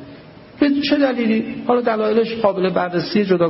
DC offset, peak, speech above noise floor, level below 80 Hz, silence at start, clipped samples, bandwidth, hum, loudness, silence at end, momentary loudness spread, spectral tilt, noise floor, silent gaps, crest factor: under 0.1%; -2 dBFS; 23 dB; -56 dBFS; 0 s; under 0.1%; 5.8 kHz; none; -18 LUFS; 0 s; 3 LU; -9.5 dB/octave; -40 dBFS; none; 16 dB